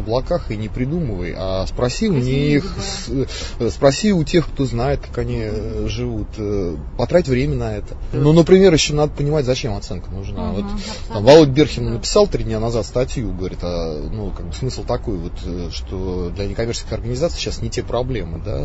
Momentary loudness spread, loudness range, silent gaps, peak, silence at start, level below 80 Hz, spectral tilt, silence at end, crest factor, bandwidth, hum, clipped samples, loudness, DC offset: 13 LU; 8 LU; none; 0 dBFS; 0 s; -28 dBFS; -6 dB/octave; 0 s; 18 dB; 8 kHz; none; under 0.1%; -19 LUFS; 0.3%